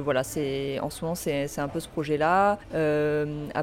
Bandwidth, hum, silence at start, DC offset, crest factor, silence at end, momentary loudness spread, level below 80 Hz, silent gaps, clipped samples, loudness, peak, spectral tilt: 16.5 kHz; none; 0 s; under 0.1%; 16 dB; 0 s; 8 LU; -50 dBFS; none; under 0.1%; -27 LUFS; -10 dBFS; -5.5 dB/octave